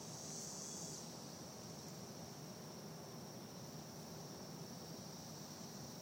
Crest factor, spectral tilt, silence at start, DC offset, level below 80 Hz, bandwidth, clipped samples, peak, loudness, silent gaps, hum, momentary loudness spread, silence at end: 16 dB; -3.5 dB/octave; 0 s; under 0.1%; -80 dBFS; 16.5 kHz; under 0.1%; -36 dBFS; -51 LUFS; none; none; 5 LU; 0 s